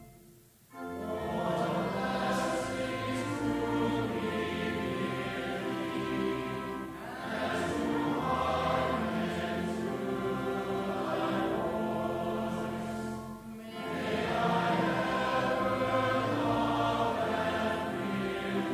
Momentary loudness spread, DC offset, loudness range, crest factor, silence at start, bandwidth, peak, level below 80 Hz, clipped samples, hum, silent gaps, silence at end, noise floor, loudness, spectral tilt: 8 LU; under 0.1%; 4 LU; 16 dB; 0 s; 16 kHz; -18 dBFS; -54 dBFS; under 0.1%; none; none; 0 s; -58 dBFS; -32 LUFS; -6 dB/octave